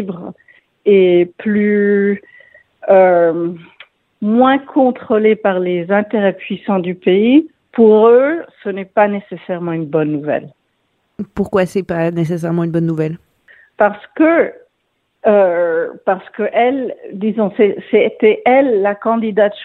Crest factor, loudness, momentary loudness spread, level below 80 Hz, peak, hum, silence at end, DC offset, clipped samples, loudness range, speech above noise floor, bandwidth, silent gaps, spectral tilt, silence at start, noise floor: 14 dB; -14 LUFS; 12 LU; -56 dBFS; 0 dBFS; none; 0 s; under 0.1%; under 0.1%; 6 LU; 53 dB; 10.5 kHz; none; -8 dB/octave; 0 s; -67 dBFS